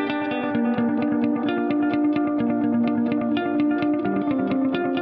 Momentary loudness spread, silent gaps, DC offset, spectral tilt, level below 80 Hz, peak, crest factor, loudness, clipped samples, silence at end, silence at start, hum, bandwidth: 2 LU; none; under 0.1%; -5.5 dB/octave; -60 dBFS; -8 dBFS; 14 dB; -22 LUFS; under 0.1%; 0 s; 0 s; none; 5 kHz